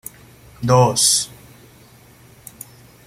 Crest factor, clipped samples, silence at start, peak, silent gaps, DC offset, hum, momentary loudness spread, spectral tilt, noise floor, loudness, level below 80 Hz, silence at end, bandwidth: 20 dB; under 0.1%; 0.6 s; -2 dBFS; none; under 0.1%; none; 25 LU; -3.5 dB/octave; -47 dBFS; -15 LUFS; -52 dBFS; 1.8 s; 16 kHz